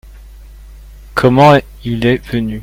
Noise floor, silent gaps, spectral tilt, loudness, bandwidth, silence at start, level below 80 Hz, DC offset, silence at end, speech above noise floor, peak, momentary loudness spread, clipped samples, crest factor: -35 dBFS; none; -7 dB/octave; -12 LUFS; 16.5 kHz; 0.1 s; -34 dBFS; under 0.1%; 0 s; 23 dB; 0 dBFS; 13 LU; 0.2%; 14 dB